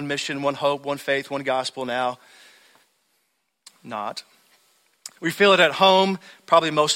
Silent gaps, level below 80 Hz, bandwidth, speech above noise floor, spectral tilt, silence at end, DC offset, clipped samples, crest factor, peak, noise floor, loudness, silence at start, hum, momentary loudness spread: none; -68 dBFS; 16 kHz; 51 dB; -3.5 dB/octave; 0 s; under 0.1%; under 0.1%; 20 dB; -2 dBFS; -72 dBFS; -21 LUFS; 0 s; none; 18 LU